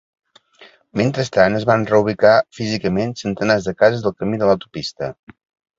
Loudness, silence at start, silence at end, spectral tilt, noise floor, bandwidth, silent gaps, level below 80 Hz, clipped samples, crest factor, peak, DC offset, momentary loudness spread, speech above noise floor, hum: -18 LUFS; 0.6 s; 0.65 s; -6 dB/octave; -49 dBFS; 7.8 kHz; none; -50 dBFS; under 0.1%; 18 dB; 0 dBFS; under 0.1%; 12 LU; 31 dB; none